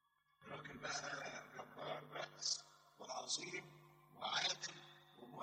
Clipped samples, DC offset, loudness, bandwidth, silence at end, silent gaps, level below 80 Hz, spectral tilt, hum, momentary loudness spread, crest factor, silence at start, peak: under 0.1%; under 0.1%; -45 LUFS; 16 kHz; 0 s; none; -84 dBFS; -1 dB/octave; none; 21 LU; 22 dB; 0.4 s; -26 dBFS